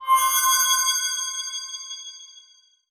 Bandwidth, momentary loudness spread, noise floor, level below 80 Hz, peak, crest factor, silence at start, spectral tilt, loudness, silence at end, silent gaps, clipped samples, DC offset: over 20 kHz; 18 LU; -56 dBFS; -88 dBFS; -8 dBFS; 16 dB; 0 s; 7.5 dB/octave; -20 LUFS; 0.5 s; none; under 0.1%; under 0.1%